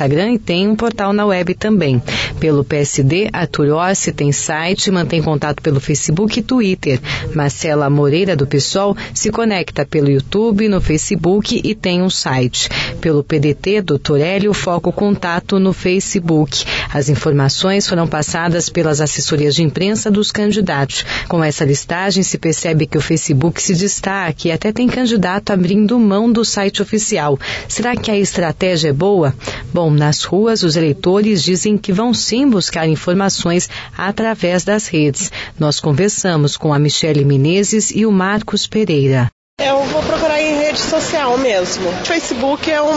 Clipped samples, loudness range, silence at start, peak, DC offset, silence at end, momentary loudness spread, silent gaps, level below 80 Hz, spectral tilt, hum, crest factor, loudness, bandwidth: under 0.1%; 2 LU; 0 s; 0 dBFS; under 0.1%; 0 s; 4 LU; 39.32-39.57 s; -38 dBFS; -5 dB/octave; none; 14 dB; -15 LUFS; 8 kHz